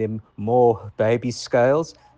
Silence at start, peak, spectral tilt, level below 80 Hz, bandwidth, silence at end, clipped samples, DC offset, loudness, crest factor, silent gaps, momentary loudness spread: 0 s; -6 dBFS; -6.5 dB/octave; -58 dBFS; 9.2 kHz; 0.25 s; under 0.1%; under 0.1%; -21 LUFS; 14 dB; none; 7 LU